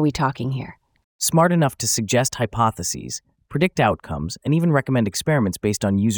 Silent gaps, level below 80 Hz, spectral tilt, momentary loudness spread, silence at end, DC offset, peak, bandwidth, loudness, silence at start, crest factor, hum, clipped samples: 1.04-1.19 s; -48 dBFS; -5 dB/octave; 11 LU; 0 s; under 0.1%; -2 dBFS; over 20 kHz; -21 LUFS; 0 s; 18 dB; none; under 0.1%